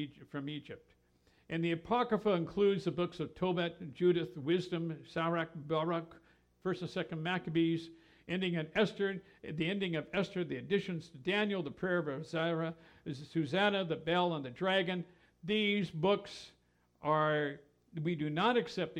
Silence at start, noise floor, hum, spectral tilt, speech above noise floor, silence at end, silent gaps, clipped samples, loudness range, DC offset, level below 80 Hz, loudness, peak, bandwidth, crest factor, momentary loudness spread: 0 s; -68 dBFS; none; -6.5 dB/octave; 33 dB; 0 s; none; under 0.1%; 3 LU; under 0.1%; -70 dBFS; -35 LUFS; -18 dBFS; 10 kHz; 18 dB; 12 LU